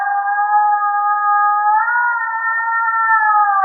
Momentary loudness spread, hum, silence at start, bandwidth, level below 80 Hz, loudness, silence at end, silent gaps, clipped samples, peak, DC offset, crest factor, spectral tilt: 5 LU; none; 0 s; 2.1 kHz; under -90 dBFS; -15 LUFS; 0 s; none; under 0.1%; -4 dBFS; under 0.1%; 12 dB; 5 dB/octave